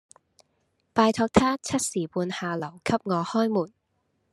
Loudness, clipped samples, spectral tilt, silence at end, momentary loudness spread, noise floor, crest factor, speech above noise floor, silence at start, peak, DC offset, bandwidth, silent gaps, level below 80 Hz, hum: -26 LUFS; under 0.1%; -5 dB/octave; 0.65 s; 8 LU; -73 dBFS; 24 dB; 49 dB; 0.95 s; -2 dBFS; under 0.1%; 13 kHz; none; -56 dBFS; none